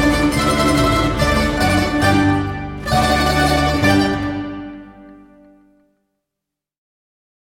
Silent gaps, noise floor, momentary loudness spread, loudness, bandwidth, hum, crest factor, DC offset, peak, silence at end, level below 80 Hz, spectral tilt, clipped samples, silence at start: none; -82 dBFS; 11 LU; -16 LUFS; 16.5 kHz; none; 16 dB; under 0.1%; -2 dBFS; 2.45 s; -30 dBFS; -5 dB/octave; under 0.1%; 0 s